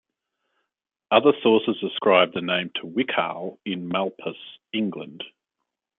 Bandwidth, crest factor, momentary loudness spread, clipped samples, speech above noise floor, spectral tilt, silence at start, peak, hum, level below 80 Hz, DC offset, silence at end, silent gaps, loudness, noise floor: 4.1 kHz; 22 dB; 17 LU; under 0.1%; 60 dB; -9 dB/octave; 1.1 s; -2 dBFS; none; -74 dBFS; under 0.1%; 0.7 s; none; -23 LUFS; -83 dBFS